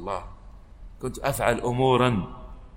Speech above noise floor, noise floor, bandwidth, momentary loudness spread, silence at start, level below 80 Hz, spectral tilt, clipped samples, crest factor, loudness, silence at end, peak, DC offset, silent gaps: 21 dB; -45 dBFS; 16 kHz; 19 LU; 0 s; -42 dBFS; -5.5 dB/octave; under 0.1%; 20 dB; -25 LUFS; 0 s; -6 dBFS; under 0.1%; none